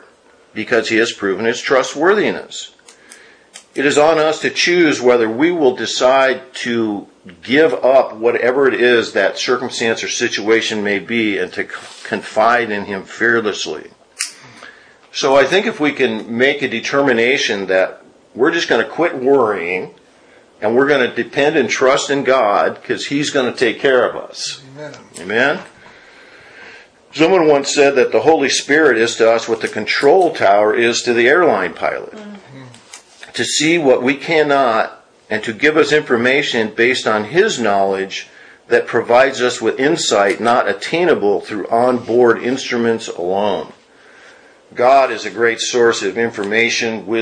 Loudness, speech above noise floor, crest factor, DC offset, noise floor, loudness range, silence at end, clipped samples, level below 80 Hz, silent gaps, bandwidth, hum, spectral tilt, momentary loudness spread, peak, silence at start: -15 LUFS; 34 dB; 16 dB; under 0.1%; -49 dBFS; 4 LU; 0 s; under 0.1%; -60 dBFS; none; 10.5 kHz; none; -3.5 dB/octave; 12 LU; 0 dBFS; 0.55 s